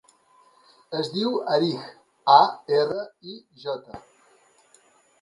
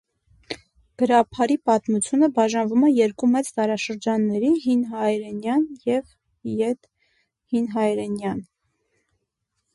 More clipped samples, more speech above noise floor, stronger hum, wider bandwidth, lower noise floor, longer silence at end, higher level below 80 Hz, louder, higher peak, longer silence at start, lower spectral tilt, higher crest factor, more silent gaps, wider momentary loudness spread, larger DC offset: neither; second, 36 dB vs 56 dB; neither; about the same, 11.5 kHz vs 11.5 kHz; second, -59 dBFS vs -77 dBFS; about the same, 1.2 s vs 1.3 s; second, -70 dBFS vs -62 dBFS; about the same, -23 LUFS vs -22 LUFS; about the same, -2 dBFS vs -4 dBFS; first, 0.9 s vs 0.5 s; about the same, -6 dB/octave vs -5.5 dB/octave; first, 24 dB vs 18 dB; neither; first, 25 LU vs 11 LU; neither